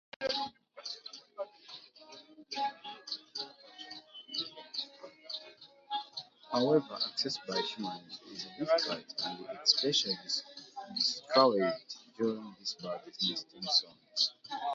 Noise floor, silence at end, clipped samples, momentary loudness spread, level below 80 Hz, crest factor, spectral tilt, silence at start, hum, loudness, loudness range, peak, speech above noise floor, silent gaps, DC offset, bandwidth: -56 dBFS; 0 s; under 0.1%; 19 LU; -82 dBFS; 26 dB; -1.5 dB/octave; 0.2 s; none; -33 LUFS; 11 LU; -10 dBFS; 23 dB; none; under 0.1%; 7.6 kHz